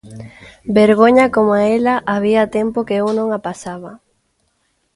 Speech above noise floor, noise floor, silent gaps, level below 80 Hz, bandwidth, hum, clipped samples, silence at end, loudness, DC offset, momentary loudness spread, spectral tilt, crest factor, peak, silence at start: 50 dB; -65 dBFS; none; -50 dBFS; 11.5 kHz; none; under 0.1%; 1 s; -14 LUFS; under 0.1%; 20 LU; -6.5 dB/octave; 16 dB; 0 dBFS; 0.05 s